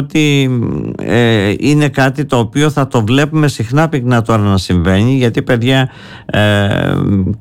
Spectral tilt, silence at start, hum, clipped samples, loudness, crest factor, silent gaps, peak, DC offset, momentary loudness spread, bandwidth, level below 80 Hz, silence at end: -6.5 dB/octave; 0 s; none; under 0.1%; -12 LUFS; 10 dB; none; -2 dBFS; under 0.1%; 4 LU; 16 kHz; -36 dBFS; 0.05 s